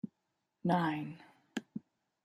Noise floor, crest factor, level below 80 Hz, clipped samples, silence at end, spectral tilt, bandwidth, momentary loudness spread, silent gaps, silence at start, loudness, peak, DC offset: -84 dBFS; 22 dB; -82 dBFS; under 0.1%; 0.45 s; -7 dB/octave; 12.5 kHz; 17 LU; none; 0.05 s; -37 LUFS; -18 dBFS; under 0.1%